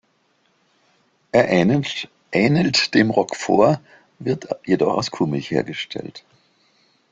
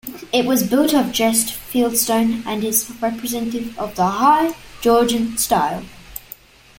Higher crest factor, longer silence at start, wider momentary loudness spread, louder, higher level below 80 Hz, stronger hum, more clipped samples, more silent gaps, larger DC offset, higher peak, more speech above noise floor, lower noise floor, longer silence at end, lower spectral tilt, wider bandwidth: about the same, 20 dB vs 16 dB; first, 1.35 s vs 0.05 s; about the same, 12 LU vs 11 LU; about the same, -20 LUFS vs -18 LUFS; second, -58 dBFS vs -48 dBFS; neither; neither; neither; neither; about the same, 0 dBFS vs -2 dBFS; first, 45 dB vs 24 dB; first, -64 dBFS vs -42 dBFS; first, 0.95 s vs 0.6 s; first, -5.5 dB/octave vs -3.5 dB/octave; second, 9.4 kHz vs 17 kHz